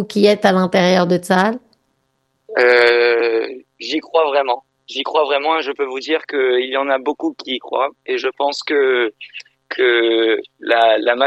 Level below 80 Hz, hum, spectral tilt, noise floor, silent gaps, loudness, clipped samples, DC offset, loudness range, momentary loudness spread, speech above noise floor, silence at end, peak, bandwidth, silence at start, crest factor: -66 dBFS; none; -5 dB/octave; -67 dBFS; none; -16 LUFS; under 0.1%; under 0.1%; 4 LU; 11 LU; 51 dB; 0 s; 0 dBFS; 12.5 kHz; 0 s; 16 dB